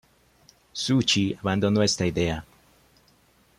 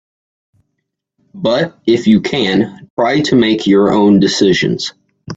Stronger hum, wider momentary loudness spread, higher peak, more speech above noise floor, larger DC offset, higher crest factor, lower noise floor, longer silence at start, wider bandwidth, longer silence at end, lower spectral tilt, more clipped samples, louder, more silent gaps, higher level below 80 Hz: neither; about the same, 10 LU vs 8 LU; second, -10 dBFS vs 0 dBFS; second, 37 dB vs 61 dB; neither; about the same, 18 dB vs 14 dB; second, -61 dBFS vs -73 dBFS; second, 0.75 s vs 1.35 s; first, 14 kHz vs 8 kHz; first, 1.15 s vs 0 s; about the same, -4.5 dB/octave vs -5.5 dB/octave; neither; second, -24 LUFS vs -12 LUFS; second, none vs 2.90-2.97 s; about the same, -52 dBFS vs -50 dBFS